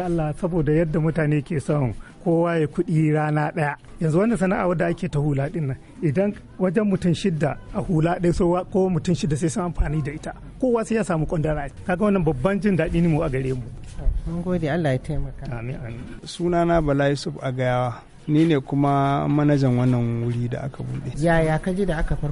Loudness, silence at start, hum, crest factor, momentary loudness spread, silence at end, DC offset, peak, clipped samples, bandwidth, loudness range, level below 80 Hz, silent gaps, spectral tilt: -23 LUFS; 0 s; none; 16 dB; 10 LU; 0 s; under 0.1%; -6 dBFS; under 0.1%; 11.5 kHz; 3 LU; -34 dBFS; none; -7.5 dB/octave